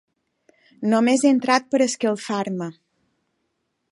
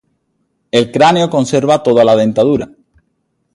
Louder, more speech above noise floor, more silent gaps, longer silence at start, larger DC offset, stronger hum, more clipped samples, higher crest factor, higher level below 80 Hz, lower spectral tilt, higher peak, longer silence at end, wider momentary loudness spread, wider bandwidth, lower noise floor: second, -21 LUFS vs -12 LUFS; about the same, 54 dB vs 54 dB; neither; about the same, 0.8 s vs 0.75 s; neither; neither; neither; first, 20 dB vs 14 dB; second, -76 dBFS vs -50 dBFS; about the same, -4.5 dB/octave vs -5.5 dB/octave; second, -4 dBFS vs 0 dBFS; first, 1.2 s vs 0.9 s; first, 11 LU vs 6 LU; about the same, 11.5 kHz vs 11.5 kHz; first, -74 dBFS vs -65 dBFS